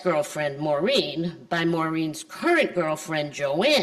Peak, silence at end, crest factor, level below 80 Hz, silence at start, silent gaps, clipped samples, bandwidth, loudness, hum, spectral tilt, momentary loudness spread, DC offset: -8 dBFS; 0 s; 16 dB; -66 dBFS; 0 s; none; under 0.1%; 14 kHz; -25 LUFS; none; -4.5 dB/octave; 7 LU; under 0.1%